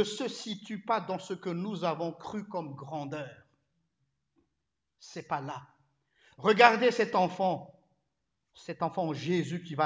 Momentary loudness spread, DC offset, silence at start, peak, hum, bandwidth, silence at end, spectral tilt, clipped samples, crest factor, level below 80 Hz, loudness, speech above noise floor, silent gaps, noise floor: 18 LU; under 0.1%; 0 s; -4 dBFS; none; 8 kHz; 0 s; -5 dB/octave; under 0.1%; 28 dB; -76 dBFS; -30 LUFS; 55 dB; none; -85 dBFS